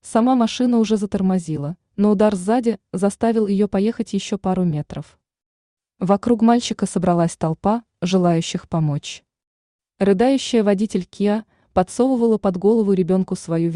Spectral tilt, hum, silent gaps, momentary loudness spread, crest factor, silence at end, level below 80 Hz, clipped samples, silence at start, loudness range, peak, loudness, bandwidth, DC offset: -6.5 dB/octave; none; 5.46-5.77 s, 9.47-9.79 s; 7 LU; 16 dB; 0 s; -52 dBFS; under 0.1%; 0.05 s; 3 LU; -4 dBFS; -19 LUFS; 11 kHz; under 0.1%